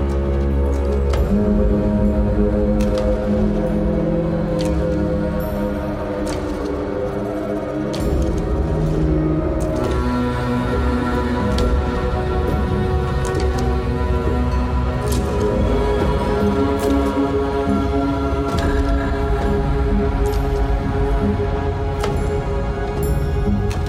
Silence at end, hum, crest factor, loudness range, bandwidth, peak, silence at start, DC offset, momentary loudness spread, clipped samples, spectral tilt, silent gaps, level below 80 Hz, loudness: 0 s; none; 14 dB; 3 LU; 15 kHz; -4 dBFS; 0 s; under 0.1%; 5 LU; under 0.1%; -7.5 dB/octave; none; -22 dBFS; -20 LUFS